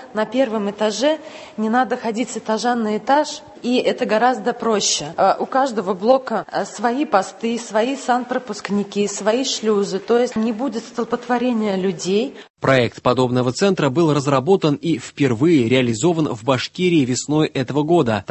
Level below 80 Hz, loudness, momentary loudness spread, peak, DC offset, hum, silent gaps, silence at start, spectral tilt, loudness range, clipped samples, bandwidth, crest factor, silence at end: -56 dBFS; -19 LUFS; 7 LU; 0 dBFS; under 0.1%; none; 12.50-12.54 s; 0 s; -5 dB/octave; 3 LU; under 0.1%; 8.6 kHz; 18 dB; 0.1 s